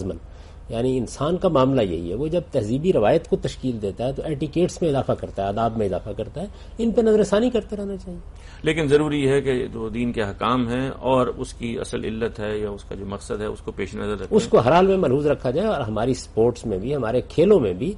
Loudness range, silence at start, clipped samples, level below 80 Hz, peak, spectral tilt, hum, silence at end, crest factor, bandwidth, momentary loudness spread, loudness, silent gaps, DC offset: 4 LU; 0 s; under 0.1%; -40 dBFS; -6 dBFS; -6.5 dB/octave; none; 0 s; 16 dB; 11.5 kHz; 12 LU; -22 LUFS; none; under 0.1%